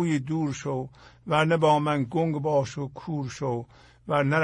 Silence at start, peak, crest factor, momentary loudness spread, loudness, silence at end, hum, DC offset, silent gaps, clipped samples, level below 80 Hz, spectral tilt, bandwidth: 0 s; -8 dBFS; 18 dB; 14 LU; -26 LUFS; 0 s; none; under 0.1%; none; under 0.1%; -60 dBFS; -6.5 dB/octave; 10.5 kHz